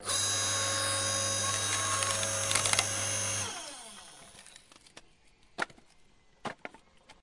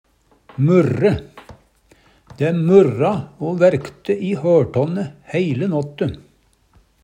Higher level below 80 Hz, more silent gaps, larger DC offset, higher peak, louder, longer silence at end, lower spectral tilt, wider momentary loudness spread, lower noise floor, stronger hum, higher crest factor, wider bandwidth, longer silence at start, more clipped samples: second, -66 dBFS vs -52 dBFS; neither; neither; second, -4 dBFS vs 0 dBFS; second, -29 LUFS vs -18 LUFS; second, 0.1 s vs 0.85 s; second, -1 dB/octave vs -8.5 dB/octave; first, 21 LU vs 12 LU; first, -62 dBFS vs -56 dBFS; neither; first, 30 dB vs 18 dB; first, 11.5 kHz vs 10 kHz; second, 0 s vs 0.6 s; neither